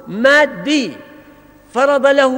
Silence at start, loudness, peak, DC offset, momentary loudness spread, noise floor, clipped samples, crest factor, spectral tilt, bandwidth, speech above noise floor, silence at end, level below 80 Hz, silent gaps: 0.05 s; -13 LUFS; 0 dBFS; under 0.1%; 11 LU; -44 dBFS; under 0.1%; 14 dB; -3.5 dB/octave; 16 kHz; 30 dB; 0 s; -56 dBFS; none